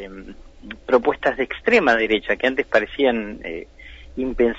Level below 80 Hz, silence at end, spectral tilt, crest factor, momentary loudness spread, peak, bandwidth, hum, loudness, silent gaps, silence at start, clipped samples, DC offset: -42 dBFS; 0 s; -5 dB/octave; 16 dB; 20 LU; -4 dBFS; 7.8 kHz; none; -20 LUFS; none; 0 s; under 0.1%; under 0.1%